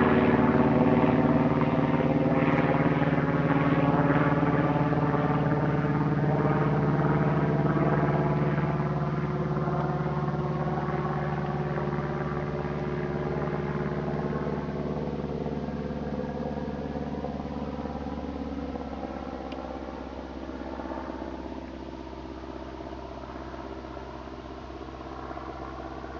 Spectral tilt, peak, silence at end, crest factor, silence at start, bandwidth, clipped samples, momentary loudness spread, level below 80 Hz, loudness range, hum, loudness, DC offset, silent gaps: -9 dB/octave; -8 dBFS; 0 s; 18 dB; 0 s; 6.6 kHz; under 0.1%; 16 LU; -46 dBFS; 14 LU; none; -27 LUFS; under 0.1%; none